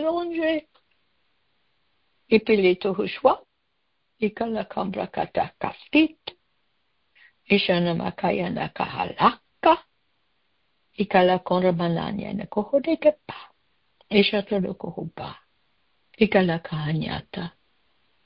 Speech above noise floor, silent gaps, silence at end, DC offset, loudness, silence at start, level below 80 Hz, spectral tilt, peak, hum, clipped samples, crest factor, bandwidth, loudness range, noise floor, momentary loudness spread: 52 dB; none; 0.75 s; under 0.1%; -24 LUFS; 0 s; -56 dBFS; -10.5 dB/octave; -4 dBFS; none; under 0.1%; 22 dB; 5.6 kHz; 3 LU; -75 dBFS; 14 LU